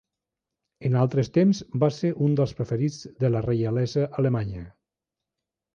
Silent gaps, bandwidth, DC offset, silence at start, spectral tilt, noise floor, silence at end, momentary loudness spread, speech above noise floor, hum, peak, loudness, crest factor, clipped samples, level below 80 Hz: none; 7.2 kHz; under 0.1%; 0.8 s; -8 dB/octave; -87 dBFS; 1.05 s; 7 LU; 64 dB; none; -8 dBFS; -25 LUFS; 18 dB; under 0.1%; -54 dBFS